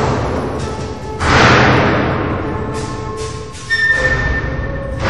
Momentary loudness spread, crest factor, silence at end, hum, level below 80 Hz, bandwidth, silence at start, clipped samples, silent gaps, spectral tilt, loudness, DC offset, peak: 15 LU; 16 dB; 0 s; none; -26 dBFS; 11.5 kHz; 0 s; under 0.1%; none; -5.5 dB/octave; -15 LUFS; 1%; 0 dBFS